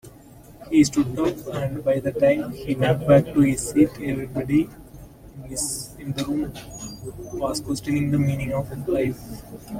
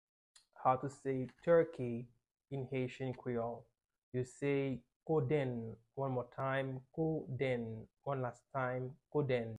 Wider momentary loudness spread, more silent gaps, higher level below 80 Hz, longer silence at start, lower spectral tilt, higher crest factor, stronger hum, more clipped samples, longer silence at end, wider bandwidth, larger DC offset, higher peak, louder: first, 17 LU vs 11 LU; second, none vs 3.98-4.12 s, 4.96-5.00 s; first, -46 dBFS vs -70 dBFS; second, 0.05 s vs 0.55 s; second, -6 dB/octave vs -8 dB/octave; about the same, 20 dB vs 20 dB; neither; neither; about the same, 0 s vs 0 s; first, 16.5 kHz vs 10.5 kHz; neither; first, -4 dBFS vs -18 dBFS; first, -23 LUFS vs -39 LUFS